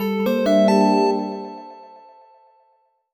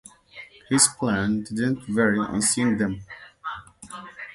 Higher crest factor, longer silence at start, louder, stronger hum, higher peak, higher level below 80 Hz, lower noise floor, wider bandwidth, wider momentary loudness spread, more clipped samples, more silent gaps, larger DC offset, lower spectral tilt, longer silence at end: second, 16 dB vs 22 dB; second, 0 s vs 0.35 s; first, -18 LUFS vs -22 LUFS; neither; second, -6 dBFS vs -2 dBFS; second, -66 dBFS vs -54 dBFS; first, -63 dBFS vs -46 dBFS; first, 19 kHz vs 12 kHz; second, 21 LU vs 24 LU; neither; neither; neither; first, -6.5 dB/octave vs -3.5 dB/octave; first, 1.3 s vs 0 s